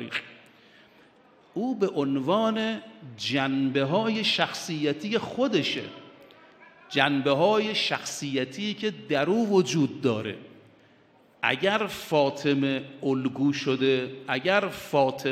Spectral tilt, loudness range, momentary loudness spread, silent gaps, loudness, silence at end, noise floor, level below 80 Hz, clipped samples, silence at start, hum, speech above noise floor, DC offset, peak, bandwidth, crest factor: -5 dB/octave; 2 LU; 9 LU; none; -26 LUFS; 0 s; -59 dBFS; -70 dBFS; under 0.1%; 0 s; none; 33 dB; under 0.1%; -4 dBFS; 15 kHz; 22 dB